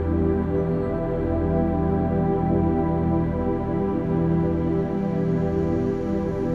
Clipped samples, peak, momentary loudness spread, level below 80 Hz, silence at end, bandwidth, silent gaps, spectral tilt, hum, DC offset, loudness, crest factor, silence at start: under 0.1%; -10 dBFS; 3 LU; -34 dBFS; 0 s; 4.6 kHz; none; -11 dB/octave; none; 0.2%; -23 LUFS; 12 dB; 0 s